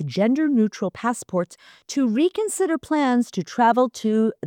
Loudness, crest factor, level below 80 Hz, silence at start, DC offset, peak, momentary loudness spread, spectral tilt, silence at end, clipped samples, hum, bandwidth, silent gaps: -22 LUFS; 14 dB; -66 dBFS; 0 s; under 0.1%; -6 dBFS; 8 LU; -5.5 dB/octave; 0 s; under 0.1%; none; 16.5 kHz; none